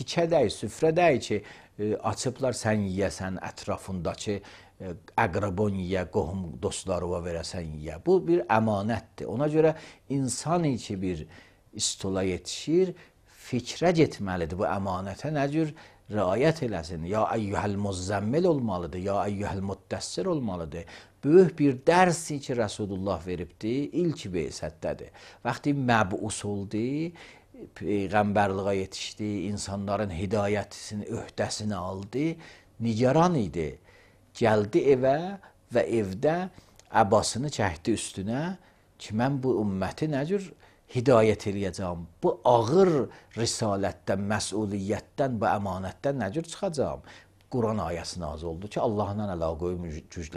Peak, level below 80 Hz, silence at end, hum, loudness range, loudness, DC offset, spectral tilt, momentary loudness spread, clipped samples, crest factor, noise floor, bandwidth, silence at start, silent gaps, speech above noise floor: -6 dBFS; -52 dBFS; 0 s; none; 6 LU; -28 LUFS; under 0.1%; -5.5 dB/octave; 12 LU; under 0.1%; 22 dB; -56 dBFS; 14 kHz; 0 s; none; 29 dB